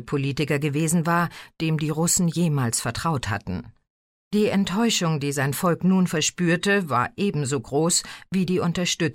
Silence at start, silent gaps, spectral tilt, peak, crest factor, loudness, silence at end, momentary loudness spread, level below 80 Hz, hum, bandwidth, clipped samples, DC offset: 0 s; 3.90-4.31 s; -4.5 dB/octave; -8 dBFS; 14 dB; -23 LUFS; 0 s; 6 LU; -52 dBFS; none; 16.5 kHz; under 0.1%; under 0.1%